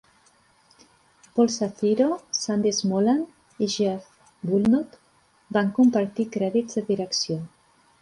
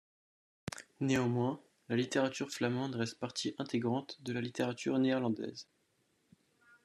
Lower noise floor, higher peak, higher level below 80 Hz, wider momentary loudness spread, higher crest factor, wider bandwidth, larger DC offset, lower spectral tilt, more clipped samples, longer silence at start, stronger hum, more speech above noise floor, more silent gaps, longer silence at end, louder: second, -61 dBFS vs -76 dBFS; first, -8 dBFS vs -18 dBFS; first, -64 dBFS vs -74 dBFS; second, 10 LU vs 14 LU; about the same, 16 dB vs 20 dB; second, 11.5 kHz vs 13 kHz; neither; about the same, -5 dB/octave vs -5.5 dB/octave; neither; first, 1.35 s vs 0.7 s; neither; about the same, 39 dB vs 41 dB; neither; second, 0.55 s vs 1.2 s; first, -24 LUFS vs -35 LUFS